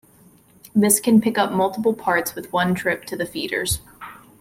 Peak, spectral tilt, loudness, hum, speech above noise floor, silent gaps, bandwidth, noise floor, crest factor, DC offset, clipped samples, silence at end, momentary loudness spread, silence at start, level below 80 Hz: -2 dBFS; -4 dB/octave; -20 LUFS; none; 32 dB; none; 16.5 kHz; -52 dBFS; 20 dB; under 0.1%; under 0.1%; 0.25 s; 11 LU; 0.75 s; -48 dBFS